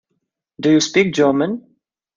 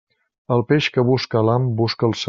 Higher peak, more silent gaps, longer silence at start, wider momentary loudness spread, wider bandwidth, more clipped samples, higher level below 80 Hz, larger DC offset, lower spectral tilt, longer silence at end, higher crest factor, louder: about the same, -2 dBFS vs -4 dBFS; neither; about the same, 0.6 s vs 0.5 s; first, 9 LU vs 4 LU; about the same, 7.6 kHz vs 7.6 kHz; neither; about the same, -60 dBFS vs -56 dBFS; neither; about the same, -4.5 dB/octave vs -5.5 dB/octave; first, 0.55 s vs 0 s; about the same, 16 dB vs 16 dB; first, -16 LUFS vs -19 LUFS